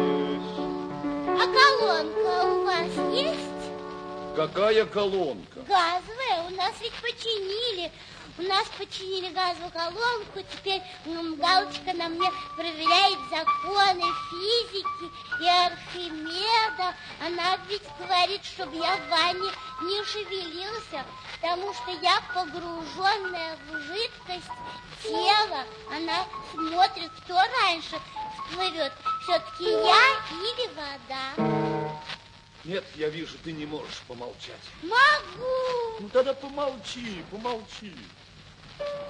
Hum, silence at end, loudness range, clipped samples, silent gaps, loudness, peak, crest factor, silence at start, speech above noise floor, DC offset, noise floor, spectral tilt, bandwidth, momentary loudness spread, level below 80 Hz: none; 0 s; 6 LU; under 0.1%; none; -26 LUFS; -4 dBFS; 24 dB; 0 s; 22 dB; under 0.1%; -49 dBFS; -3.5 dB/octave; 10.5 kHz; 15 LU; -60 dBFS